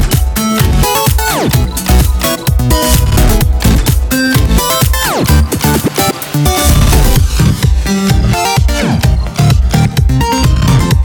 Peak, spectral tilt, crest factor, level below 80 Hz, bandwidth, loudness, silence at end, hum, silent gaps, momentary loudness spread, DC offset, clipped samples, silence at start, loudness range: 0 dBFS; -5 dB/octave; 10 dB; -14 dBFS; over 20 kHz; -10 LUFS; 0 s; none; none; 3 LU; under 0.1%; under 0.1%; 0 s; 1 LU